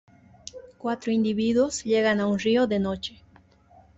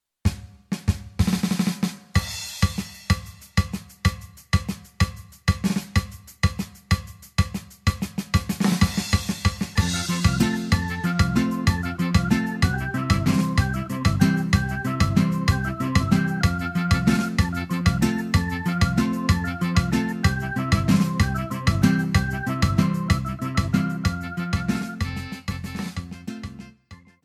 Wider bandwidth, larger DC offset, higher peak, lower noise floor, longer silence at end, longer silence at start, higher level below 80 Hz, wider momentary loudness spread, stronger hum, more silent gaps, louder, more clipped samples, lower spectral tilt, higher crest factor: second, 8 kHz vs 15 kHz; neither; second, -12 dBFS vs -4 dBFS; first, -56 dBFS vs -48 dBFS; first, 0.9 s vs 0.3 s; first, 0.55 s vs 0.25 s; second, -58 dBFS vs -34 dBFS; first, 20 LU vs 9 LU; neither; neither; about the same, -24 LUFS vs -24 LUFS; neither; about the same, -5 dB/octave vs -5.5 dB/octave; about the same, 14 dB vs 18 dB